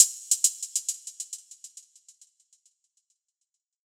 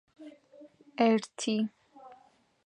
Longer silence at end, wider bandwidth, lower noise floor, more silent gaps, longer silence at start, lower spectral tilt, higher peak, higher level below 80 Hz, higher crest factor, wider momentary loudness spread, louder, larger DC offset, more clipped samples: first, 2.15 s vs 0.6 s; first, over 20 kHz vs 10.5 kHz; first, -83 dBFS vs -63 dBFS; neither; second, 0 s vs 0.2 s; second, 9 dB/octave vs -4.5 dB/octave; first, -2 dBFS vs -12 dBFS; second, under -90 dBFS vs -84 dBFS; first, 30 dB vs 20 dB; about the same, 23 LU vs 25 LU; first, -26 LUFS vs -30 LUFS; neither; neither